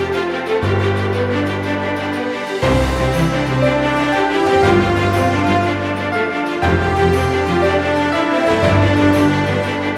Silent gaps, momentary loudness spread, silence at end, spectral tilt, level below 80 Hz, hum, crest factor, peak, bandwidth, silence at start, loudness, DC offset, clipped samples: none; 6 LU; 0 s; -6.5 dB/octave; -32 dBFS; none; 14 dB; -2 dBFS; 15 kHz; 0 s; -16 LUFS; under 0.1%; under 0.1%